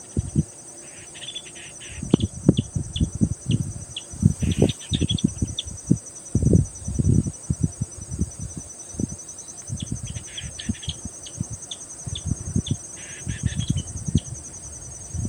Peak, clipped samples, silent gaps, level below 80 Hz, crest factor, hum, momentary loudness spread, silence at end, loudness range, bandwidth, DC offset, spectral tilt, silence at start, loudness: 0 dBFS; under 0.1%; none; -36 dBFS; 24 dB; none; 13 LU; 0 s; 8 LU; 18.5 kHz; under 0.1%; -5.5 dB/octave; 0 s; -27 LUFS